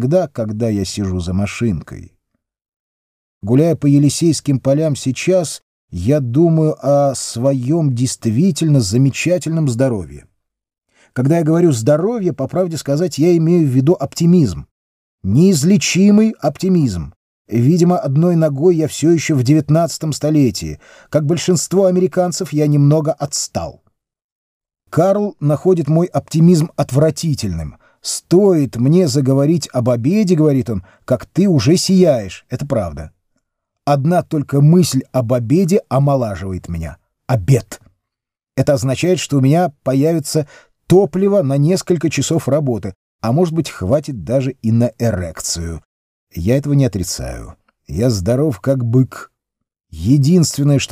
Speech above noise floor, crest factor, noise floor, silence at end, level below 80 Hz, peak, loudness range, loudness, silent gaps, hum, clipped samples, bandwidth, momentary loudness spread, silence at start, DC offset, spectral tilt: 69 dB; 14 dB; -83 dBFS; 0.05 s; -42 dBFS; 0 dBFS; 4 LU; -15 LUFS; 2.76-3.41 s, 5.63-5.88 s, 14.71-15.18 s, 17.16-17.45 s, 24.24-24.60 s, 42.96-43.19 s, 45.85-46.27 s; none; under 0.1%; 16 kHz; 12 LU; 0 s; under 0.1%; -6.5 dB/octave